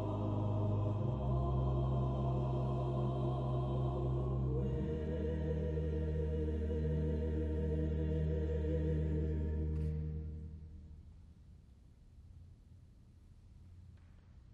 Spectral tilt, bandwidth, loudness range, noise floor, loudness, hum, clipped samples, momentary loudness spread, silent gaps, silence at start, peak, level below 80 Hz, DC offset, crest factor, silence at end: -10.5 dB/octave; 4.3 kHz; 8 LU; -60 dBFS; -37 LUFS; none; under 0.1%; 13 LU; none; 0 s; -24 dBFS; -42 dBFS; under 0.1%; 12 dB; 0 s